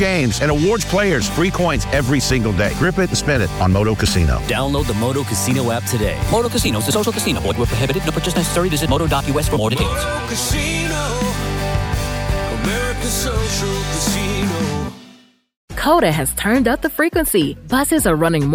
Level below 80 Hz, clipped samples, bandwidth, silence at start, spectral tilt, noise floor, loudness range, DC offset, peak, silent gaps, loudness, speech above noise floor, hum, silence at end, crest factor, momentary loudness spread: -28 dBFS; under 0.1%; 19.5 kHz; 0 s; -4.5 dB/octave; -47 dBFS; 3 LU; under 0.1%; 0 dBFS; 15.57-15.68 s; -18 LUFS; 31 dB; none; 0 s; 16 dB; 5 LU